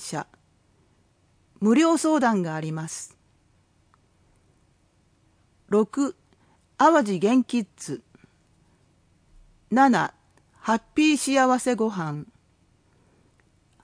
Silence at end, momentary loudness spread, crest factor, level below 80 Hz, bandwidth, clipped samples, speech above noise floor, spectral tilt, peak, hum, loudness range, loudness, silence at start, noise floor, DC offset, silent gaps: 1.6 s; 16 LU; 20 dB; -66 dBFS; 10.5 kHz; under 0.1%; 42 dB; -5 dB/octave; -6 dBFS; none; 8 LU; -23 LUFS; 0 s; -64 dBFS; under 0.1%; none